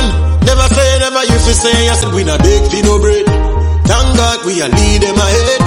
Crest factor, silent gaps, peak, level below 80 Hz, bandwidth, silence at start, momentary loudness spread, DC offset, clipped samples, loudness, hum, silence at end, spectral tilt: 10 dB; none; 0 dBFS; -14 dBFS; 13 kHz; 0 s; 3 LU; under 0.1%; under 0.1%; -10 LUFS; none; 0 s; -4.5 dB/octave